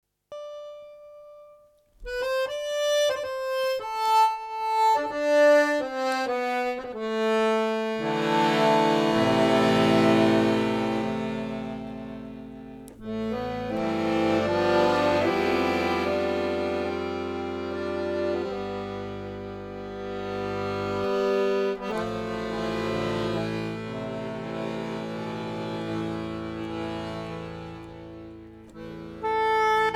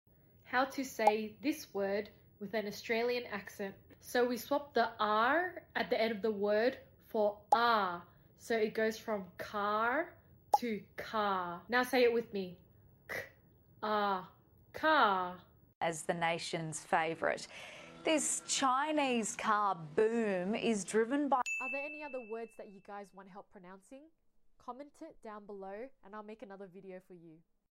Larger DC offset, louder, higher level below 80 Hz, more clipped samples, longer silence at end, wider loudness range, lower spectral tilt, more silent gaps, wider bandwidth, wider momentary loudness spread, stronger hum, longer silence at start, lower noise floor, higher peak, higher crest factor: neither; first, -26 LUFS vs -34 LUFS; first, -54 dBFS vs -72 dBFS; neither; second, 0 s vs 0.4 s; second, 10 LU vs 17 LU; first, -5.5 dB/octave vs -3.5 dB/octave; second, none vs 15.75-15.81 s; about the same, 16.5 kHz vs 16 kHz; about the same, 18 LU vs 19 LU; neither; second, 0.3 s vs 0.45 s; second, -57 dBFS vs -64 dBFS; first, -8 dBFS vs -14 dBFS; about the same, 18 dB vs 22 dB